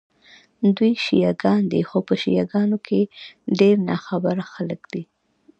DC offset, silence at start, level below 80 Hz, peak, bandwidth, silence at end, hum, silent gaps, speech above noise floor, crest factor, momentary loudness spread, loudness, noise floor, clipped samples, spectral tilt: under 0.1%; 0.6 s; -62 dBFS; -4 dBFS; 8 kHz; 0.55 s; none; none; 32 dB; 18 dB; 12 LU; -21 LUFS; -52 dBFS; under 0.1%; -7.5 dB/octave